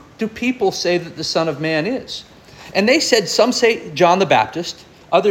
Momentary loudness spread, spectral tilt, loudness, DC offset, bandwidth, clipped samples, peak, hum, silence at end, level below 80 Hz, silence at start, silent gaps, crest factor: 12 LU; -3.5 dB/octave; -17 LUFS; under 0.1%; 17 kHz; under 0.1%; -2 dBFS; none; 0 s; -54 dBFS; 0.2 s; none; 16 dB